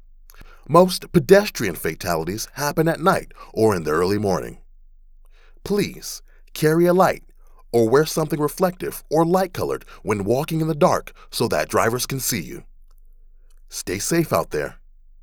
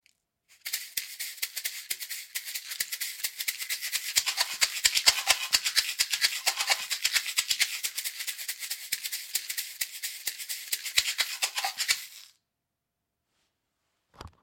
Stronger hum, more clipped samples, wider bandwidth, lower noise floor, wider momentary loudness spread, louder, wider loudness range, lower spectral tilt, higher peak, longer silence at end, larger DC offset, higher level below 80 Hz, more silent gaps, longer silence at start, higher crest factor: neither; neither; first, over 20 kHz vs 17 kHz; second, -47 dBFS vs -84 dBFS; first, 15 LU vs 11 LU; first, -21 LUFS vs -28 LUFS; second, 5 LU vs 8 LU; first, -5 dB/octave vs 3.5 dB/octave; first, 0 dBFS vs -4 dBFS; first, 0.5 s vs 0.15 s; neither; first, -44 dBFS vs -68 dBFS; neither; second, 0.35 s vs 0.65 s; second, 22 dB vs 28 dB